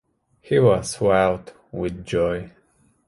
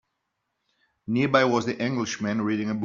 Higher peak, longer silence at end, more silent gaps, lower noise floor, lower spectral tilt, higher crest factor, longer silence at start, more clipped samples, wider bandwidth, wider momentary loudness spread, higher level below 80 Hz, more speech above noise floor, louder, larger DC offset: about the same, -4 dBFS vs -6 dBFS; first, 0.6 s vs 0 s; neither; second, -61 dBFS vs -79 dBFS; first, -6 dB/octave vs -4.5 dB/octave; about the same, 20 dB vs 22 dB; second, 0.5 s vs 1.05 s; neither; first, 11.5 kHz vs 7.6 kHz; first, 14 LU vs 7 LU; first, -46 dBFS vs -66 dBFS; second, 40 dB vs 55 dB; first, -21 LUFS vs -25 LUFS; neither